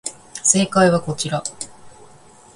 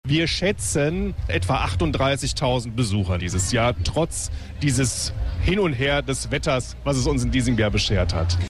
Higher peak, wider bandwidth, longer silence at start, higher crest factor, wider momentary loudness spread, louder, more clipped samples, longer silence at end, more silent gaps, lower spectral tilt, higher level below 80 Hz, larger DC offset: first, 0 dBFS vs -10 dBFS; second, 11.5 kHz vs 13 kHz; about the same, 0.05 s vs 0.05 s; first, 20 dB vs 12 dB; first, 17 LU vs 5 LU; first, -18 LUFS vs -22 LUFS; neither; first, 0.65 s vs 0 s; neither; about the same, -3.5 dB/octave vs -4.5 dB/octave; second, -56 dBFS vs -32 dBFS; neither